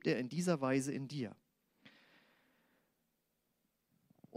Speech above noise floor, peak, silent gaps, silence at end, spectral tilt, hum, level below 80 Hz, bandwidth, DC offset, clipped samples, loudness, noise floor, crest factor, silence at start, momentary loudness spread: 46 dB; -22 dBFS; none; 0 s; -6 dB/octave; none; -84 dBFS; 15 kHz; under 0.1%; under 0.1%; -38 LUFS; -83 dBFS; 20 dB; 0.05 s; 10 LU